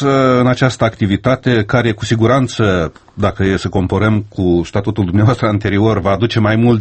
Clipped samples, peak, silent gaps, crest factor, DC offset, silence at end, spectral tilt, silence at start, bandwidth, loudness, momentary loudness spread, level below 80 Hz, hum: under 0.1%; 0 dBFS; none; 14 dB; under 0.1%; 0 s; -7 dB/octave; 0 s; 8.6 kHz; -14 LUFS; 5 LU; -36 dBFS; none